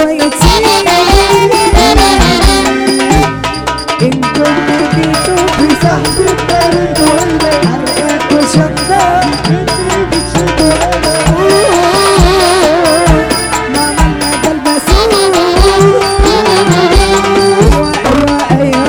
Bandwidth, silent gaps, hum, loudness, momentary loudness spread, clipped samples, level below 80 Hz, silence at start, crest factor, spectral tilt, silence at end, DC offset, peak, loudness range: over 20 kHz; none; none; -8 LUFS; 5 LU; 0.4%; -18 dBFS; 0 s; 8 dB; -4.5 dB/octave; 0 s; under 0.1%; 0 dBFS; 2 LU